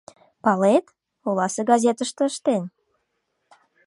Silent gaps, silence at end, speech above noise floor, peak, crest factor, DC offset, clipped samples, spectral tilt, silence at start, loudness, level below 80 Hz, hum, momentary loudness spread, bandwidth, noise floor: none; 1.2 s; 54 dB; -4 dBFS; 18 dB; under 0.1%; under 0.1%; -5 dB/octave; 0.45 s; -22 LUFS; -74 dBFS; none; 8 LU; 11.5 kHz; -74 dBFS